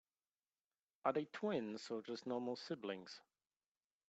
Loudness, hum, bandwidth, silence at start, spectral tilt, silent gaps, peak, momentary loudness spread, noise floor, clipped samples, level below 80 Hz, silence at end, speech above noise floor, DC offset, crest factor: -44 LUFS; none; 8.4 kHz; 1.05 s; -5.5 dB/octave; none; -24 dBFS; 9 LU; under -90 dBFS; under 0.1%; under -90 dBFS; 0.9 s; over 46 dB; under 0.1%; 22 dB